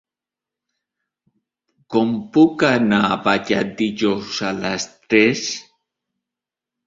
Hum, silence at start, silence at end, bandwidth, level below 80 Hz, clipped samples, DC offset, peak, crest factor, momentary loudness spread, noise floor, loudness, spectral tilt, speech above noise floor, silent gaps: none; 1.9 s; 1.25 s; 7.8 kHz; -58 dBFS; under 0.1%; under 0.1%; -2 dBFS; 18 dB; 9 LU; -88 dBFS; -18 LUFS; -4.5 dB/octave; 70 dB; none